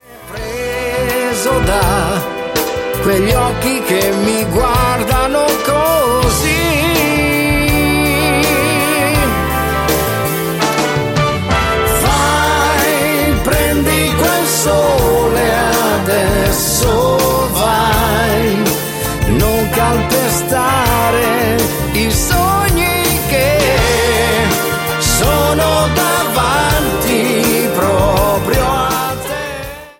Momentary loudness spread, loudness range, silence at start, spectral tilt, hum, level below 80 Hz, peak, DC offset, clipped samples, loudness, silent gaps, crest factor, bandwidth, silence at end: 4 LU; 2 LU; 0.1 s; -4 dB/octave; none; -24 dBFS; 0 dBFS; under 0.1%; under 0.1%; -13 LUFS; none; 14 dB; 17 kHz; 0.1 s